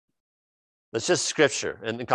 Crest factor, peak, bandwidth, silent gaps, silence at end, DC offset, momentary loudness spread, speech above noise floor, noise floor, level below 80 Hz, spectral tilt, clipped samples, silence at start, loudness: 22 dB; -6 dBFS; 12 kHz; none; 0 s; under 0.1%; 11 LU; over 65 dB; under -90 dBFS; -64 dBFS; -3 dB/octave; under 0.1%; 0.95 s; -25 LUFS